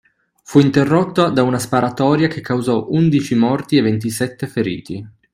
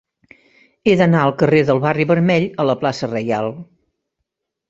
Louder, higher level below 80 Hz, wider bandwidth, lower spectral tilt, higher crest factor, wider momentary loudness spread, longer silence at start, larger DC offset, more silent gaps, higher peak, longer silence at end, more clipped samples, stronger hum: about the same, -16 LUFS vs -16 LUFS; about the same, -52 dBFS vs -54 dBFS; first, 15 kHz vs 7.8 kHz; about the same, -6.5 dB/octave vs -7.5 dB/octave; about the same, 16 dB vs 18 dB; about the same, 8 LU vs 8 LU; second, 0.5 s vs 0.85 s; neither; neither; about the same, 0 dBFS vs 0 dBFS; second, 0.25 s vs 1.05 s; neither; neither